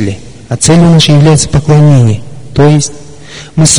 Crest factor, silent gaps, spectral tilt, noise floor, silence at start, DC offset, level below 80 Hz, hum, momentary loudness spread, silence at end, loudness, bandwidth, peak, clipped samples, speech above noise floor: 6 dB; none; -5 dB/octave; -28 dBFS; 0 s; under 0.1%; -30 dBFS; none; 15 LU; 0 s; -7 LUFS; 11 kHz; 0 dBFS; 0.6%; 23 dB